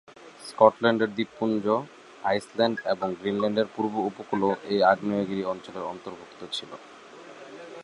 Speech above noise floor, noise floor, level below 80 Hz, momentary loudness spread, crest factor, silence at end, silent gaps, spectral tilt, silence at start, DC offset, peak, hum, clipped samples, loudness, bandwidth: 20 dB; -46 dBFS; -68 dBFS; 22 LU; 24 dB; 0 s; none; -6 dB/octave; 0.2 s; under 0.1%; -2 dBFS; none; under 0.1%; -26 LUFS; 11.5 kHz